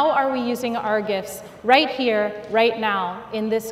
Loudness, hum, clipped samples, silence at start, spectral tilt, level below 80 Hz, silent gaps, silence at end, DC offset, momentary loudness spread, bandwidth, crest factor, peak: -21 LUFS; none; under 0.1%; 0 s; -4 dB/octave; -60 dBFS; none; 0 s; under 0.1%; 10 LU; 16 kHz; 20 dB; 0 dBFS